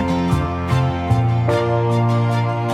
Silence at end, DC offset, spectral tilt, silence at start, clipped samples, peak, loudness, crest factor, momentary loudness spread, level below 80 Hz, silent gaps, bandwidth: 0 s; under 0.1%; -8 dB/octave; 0 s; under 0.1%; -6 dBFS; -18 LUFS; 12 dB; 2 LU; -36 dBFS; none; 10.5 kHz